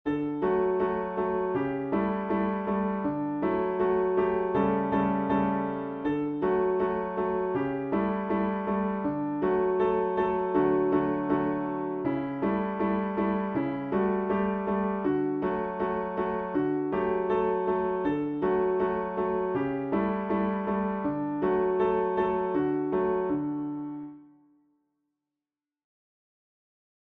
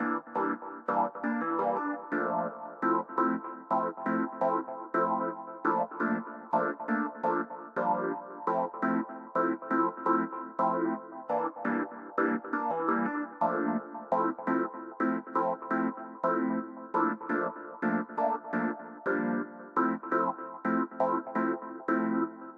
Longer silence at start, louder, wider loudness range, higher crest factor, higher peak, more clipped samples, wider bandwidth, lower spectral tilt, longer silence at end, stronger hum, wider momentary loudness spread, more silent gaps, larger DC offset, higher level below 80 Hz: about the same, 0.05 s vs 0 s; first, -28 LUFS vs -31 LUFS; about the same, 2 LU vs 1 LU; about the same, 16 dB vs 16 dB; about the same, -12 dBFS vs -14 dBFS; neither; second, 4.3 kHz vs 5.6 kHz; about the same, -10.5 dB/octave vs -9.5 dB/octave; first, 2.8 s vs 0 s; neither; about the same, 4 LU vs 5 LU; neither; neither; first, -56 dBFS vs -88 dBFS